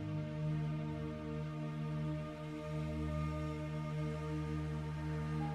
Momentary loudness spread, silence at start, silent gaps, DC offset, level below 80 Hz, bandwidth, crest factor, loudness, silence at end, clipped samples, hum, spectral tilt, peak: 3 LU; 0 s; none; under 0.1%; -52 dBFS; 9.4 kHz; 12 dB; -41 LUFS; 0 s; under 0.1%; none; -8 dB/octave; -28 dBFS